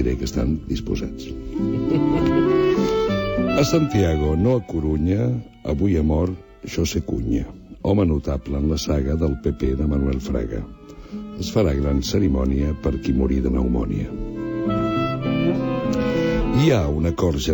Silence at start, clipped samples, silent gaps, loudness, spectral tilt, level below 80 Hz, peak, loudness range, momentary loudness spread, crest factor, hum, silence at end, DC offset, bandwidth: 0 s; under 0.1%; none; -22 LUFS; -7 dB/octave; -30 dBFS; -6 dBFS; 4 LU; 10 LU; 16 dB; none; 0 s; under 0.1%; 19.5 kHz